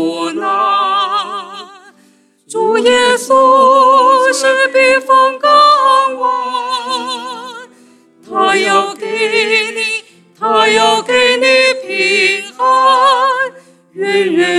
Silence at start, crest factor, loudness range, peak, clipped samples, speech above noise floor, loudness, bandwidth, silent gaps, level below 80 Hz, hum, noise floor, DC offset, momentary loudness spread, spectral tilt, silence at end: 0 s; 12 dB; 6 LU; 0 dBFS; under 0.1%; 41 dB; -11 LUFS; 13.5 kHz; none; -62 dBFS; none; -50 dBFS; under 0.1%; 13 LU; -2 dB/octave; 0 s